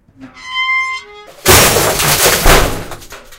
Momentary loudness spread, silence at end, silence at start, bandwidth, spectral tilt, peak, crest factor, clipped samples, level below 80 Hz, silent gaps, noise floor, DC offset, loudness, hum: 18 LU; 0.05 s; 0.2 s; over 20 kHz; -2 dB/octave; 0 dBFS; 12 dB; 0.7%; -22 dBFS; none; -31 dBFS; under 0.1%; -10 LUFS; none